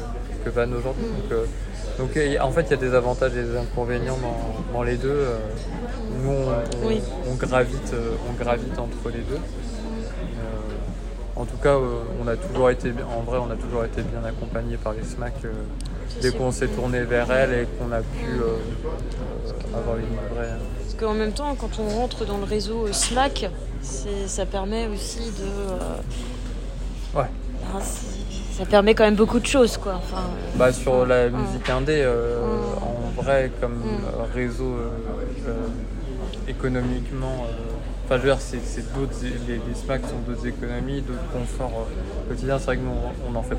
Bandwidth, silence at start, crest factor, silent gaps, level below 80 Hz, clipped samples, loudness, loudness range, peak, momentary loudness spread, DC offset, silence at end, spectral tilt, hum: 15.5 kHz; 0 s; 22 dB; none; -30 dBFS; under 0.1%; -25 LUFS; 8 LU; -2 dBFS; 11 LU; under 0.1%; 0 s; -5.5 dB/octave; none